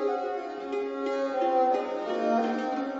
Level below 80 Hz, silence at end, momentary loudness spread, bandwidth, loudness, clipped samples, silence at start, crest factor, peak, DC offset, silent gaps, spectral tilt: -72 dBFS; 0 s; 8 LU; 7.8 kHz; -29 LUFS; under 0.1%; 0 s; 14 dB; -14 dBFS; under 0.1%; none; -5 dB/octave